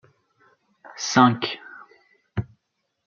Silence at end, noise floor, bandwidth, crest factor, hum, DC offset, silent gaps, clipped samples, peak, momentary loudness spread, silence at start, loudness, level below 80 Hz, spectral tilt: 0.6 s; -77 dBFS; 7.2 kHz; 24 dB; none; under 0.1%; none; under 0.1%; -2 dBFS; 26 LU; 0.95 s; -22 LUFS; -58 dBFS; -4.5 dB/octave